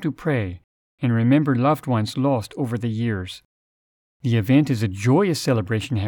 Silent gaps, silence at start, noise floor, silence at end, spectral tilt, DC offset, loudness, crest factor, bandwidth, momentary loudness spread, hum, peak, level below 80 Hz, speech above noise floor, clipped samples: 0.64-0.98 s, 3.45-4.20 s; 0 s; under -90 dBFS; 0 s; -7 dB/octave; under 0.1%; -21 LUFS; 16 dB; 19 kHz; 12 LU; none; -6 dBFS; -56 dBFS; over 70 dB; under 0.1%